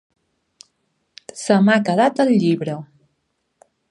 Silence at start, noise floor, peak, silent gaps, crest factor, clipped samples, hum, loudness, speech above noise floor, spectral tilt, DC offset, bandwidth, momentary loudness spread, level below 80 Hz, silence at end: 1.35 s; -71 dBFS; -2 dBFS; none; 18 dB; under 0.1%; none; -17 LUFS; 55 dB; -6 dB/octave; under 0.1%; 11 kHz; 16 LU; -70 dBFS; 1.05 s